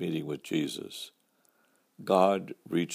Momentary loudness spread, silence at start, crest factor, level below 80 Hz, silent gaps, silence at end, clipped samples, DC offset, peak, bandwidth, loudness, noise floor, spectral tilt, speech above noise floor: 18 LU; 0 s; 22 dB; -78 dBFS; none; 0 s; under 0.1%; under 0.1%; -10 dBFS; 15.5 kHz; -30 LUFS; -69 dBFS; -5.5 dB/octave; 40 dB